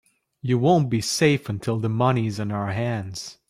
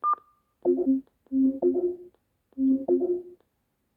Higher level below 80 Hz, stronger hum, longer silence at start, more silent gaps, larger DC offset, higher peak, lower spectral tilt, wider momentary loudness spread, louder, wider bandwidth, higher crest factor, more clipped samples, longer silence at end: first, -58 dBFS vs -68 dBFS; neither; first, 0.45 s vs 0.05 s; neither; neither; first, -6 dBFS vs -14 dBFS; second, -5.5 dB/octave vs -11 dB/octave; about the same, 8 LU vs 8 LU; first, -23 LUFS vs -27 LUFS; first, 15 kHz vs 1.8 kHz; about the same, 16 dB vs 14 dB; neither; second, 0.2 s vs 0.6 s